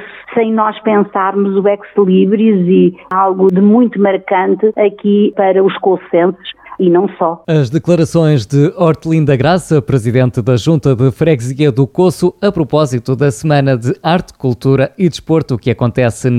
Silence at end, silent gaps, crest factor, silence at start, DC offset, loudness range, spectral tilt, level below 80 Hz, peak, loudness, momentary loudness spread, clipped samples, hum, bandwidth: 0 s; none; 10 dB; 0 s; under 0.1%; 2 LU; -7.5 dB/octave; -44 dBFS; 0 dBFS; -12 LUFS; 5 LU; under 0.1%; none; 13 kHz